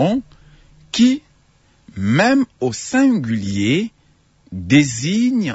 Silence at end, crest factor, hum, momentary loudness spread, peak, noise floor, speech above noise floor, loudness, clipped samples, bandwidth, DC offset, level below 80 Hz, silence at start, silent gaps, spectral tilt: 0 s; 16 dB; none; 11 LU; -2 dBFS; -56 dBFS; 39 dB; -17 LUFS; under 0.1%; 8 kHz; under 0.1%; -52 dBFS; 0 s; none; -5 dB/octave